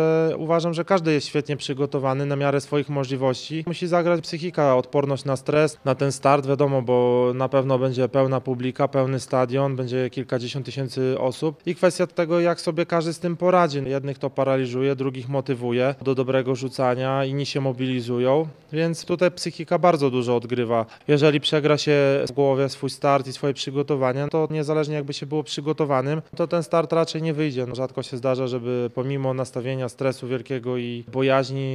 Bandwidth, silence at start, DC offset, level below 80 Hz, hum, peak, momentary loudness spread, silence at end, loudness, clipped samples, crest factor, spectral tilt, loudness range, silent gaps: 12 kHz; 0 s; under 0.1%; -66 dBFS; none; -2 dBFS; 8 LU; 0 s; -23 LUFS; under 0.1%; 20 dB; -6.5 dB/octave; 4 LU; none